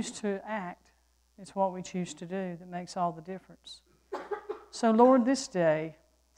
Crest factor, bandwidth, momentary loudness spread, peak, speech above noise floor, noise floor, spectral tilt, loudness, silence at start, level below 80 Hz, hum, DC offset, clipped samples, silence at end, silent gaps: 22 dB; 10.5 kHz; 21 LU; -8 dBFS; 38 dB; -68 dBFS; -5.5 dB/octave; -30 LUFS; 0 s; -70 dBFS; none; under 0.1%; under 0.1%; 0.45 s; none